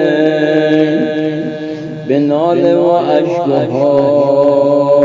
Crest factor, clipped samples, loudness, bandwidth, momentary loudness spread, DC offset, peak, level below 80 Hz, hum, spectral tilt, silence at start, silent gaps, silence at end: 10 dB; under 0.1%; -12 LUFS; 7.6 kHz; 8 LU; under 0.1%; 0 dBFS; -58 dBFS; none; -8 dB/octave; 0 s; none; 0 s